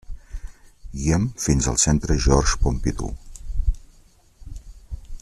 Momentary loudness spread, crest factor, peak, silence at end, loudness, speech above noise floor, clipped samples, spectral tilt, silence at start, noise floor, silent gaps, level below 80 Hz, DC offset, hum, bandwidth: 22 LU; 20 dB; -2 dBFS; 0.05 s; -22 LUFS; 33 dB; under 0.1%; -4.5 dB/octave; 0.1 s; -53 dBFS; none; -28 dBFS; under 0.1%; none; 13 kHz